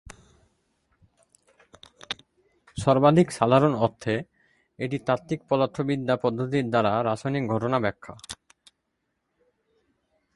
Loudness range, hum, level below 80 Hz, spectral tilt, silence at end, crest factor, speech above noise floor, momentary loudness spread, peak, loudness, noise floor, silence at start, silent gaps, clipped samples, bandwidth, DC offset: 5 LU; none; -58 dBFS; -6.5 dB/octave; 2 s; 24 dB; 54 dB; 16 LU; -4 dBFS; -25 LUFS; -78 dBFS; 2.1 s; none; under 0.1%; 11.5 kHz; under 0.1%